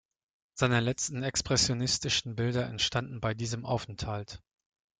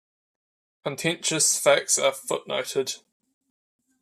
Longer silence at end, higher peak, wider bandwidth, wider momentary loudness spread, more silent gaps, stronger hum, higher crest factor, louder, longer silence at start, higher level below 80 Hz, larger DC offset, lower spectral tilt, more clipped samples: second, 0.65 s vs 1.05 s; second, -10 dBFS vs -6 dBFS; second, 9.6 kHz vs 14.5 kHz; second, 10 LU vs 14 LU; neither; neither; about the same, 22 dB vs 22 dB; second, -30 LUFS vs -23 LUFS; second, 0.55 s vs 0.85 s; first, -54 dBFS vs -76 dBFS; neither; first, -3.5 dB/octave vs -1.5 dB/octave; neither